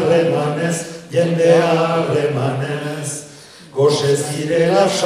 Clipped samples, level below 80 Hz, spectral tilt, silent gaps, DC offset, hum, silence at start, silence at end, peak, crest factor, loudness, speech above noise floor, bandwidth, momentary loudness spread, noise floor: under 0.1%; -60 dBFS; -5 dB/octave; none; under 0.1%; none; 0 s; 0 s; 0 dBFS; 16 dB; -17 LUFS; 24 dB; 14.5 kHz; 12 LU; -40 dBFS